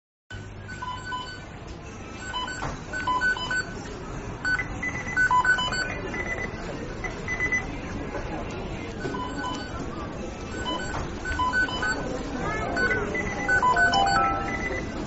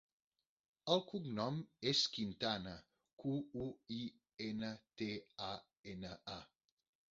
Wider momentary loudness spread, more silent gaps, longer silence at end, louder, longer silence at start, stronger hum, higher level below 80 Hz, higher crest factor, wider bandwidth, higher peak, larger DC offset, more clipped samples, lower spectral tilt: about the same, 15 LU vs 14 LU; second, none vs 3.13-3.17 s, 5.79-5.84 s; second, 0 s vs 0.65 s; first, -27 LUFS vs -42 LUFS; second, 0.3 s vs 0.85 s; neither; first, -40 dBFS vs -72 dBFS; second, 18 dB vs 26 dB; about the same, 8 kHz vs 7.6 kHz; first, -10 dBFS vs -18 dBFS; neither; neither; about the same, -2.5 dB/octave vs -3.5 dB/octave